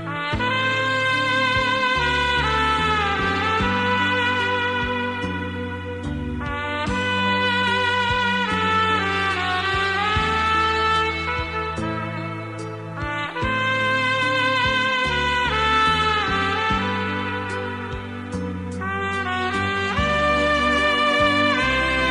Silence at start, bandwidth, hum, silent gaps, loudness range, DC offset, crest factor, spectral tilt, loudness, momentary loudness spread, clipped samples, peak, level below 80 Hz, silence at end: 0 s; 12 kHz; none; none; 4 LU; 0.1%; 16 dB; -4.5 dB/octave; -21 LUFS; 10 LU; under 0.1%; -6 dBFS; -38 dBFS; 0 s